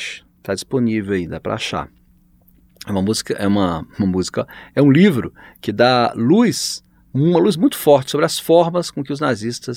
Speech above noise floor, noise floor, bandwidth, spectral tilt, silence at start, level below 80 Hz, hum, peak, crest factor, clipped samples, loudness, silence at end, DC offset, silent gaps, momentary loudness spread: 36 dB; -53 dBFS; 18.5 kHz; -5.5 dB/octave; 0 s; -50 dBFS; none; 0 dBFS; 18 dB; under 0.1%; -17 LUFS; 0 s; under 0.1%; none; 12 LU